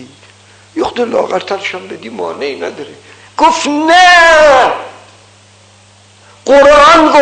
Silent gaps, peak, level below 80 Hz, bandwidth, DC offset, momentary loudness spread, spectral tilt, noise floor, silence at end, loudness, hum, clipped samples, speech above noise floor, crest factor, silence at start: none; 0 dBFS; -40 dBFS; 9.6 kHz; under 0.1%; 21 LU; -2.5 dB/octave; -42 dBFS; 0 s; -8 LUFS; none; under 0.1%; 35 dB; 10 dB; 0 s